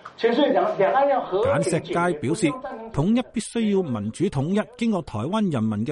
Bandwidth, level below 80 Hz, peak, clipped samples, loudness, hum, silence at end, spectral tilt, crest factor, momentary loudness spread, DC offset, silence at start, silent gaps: 11.5 kHz; -52 dBFS; -8 dBFS; under 0.1%; -23 LUFS; none; 0 s; -6 dB/octave; 14 dB; 6 LU; under 0.1%; 0.05 s; none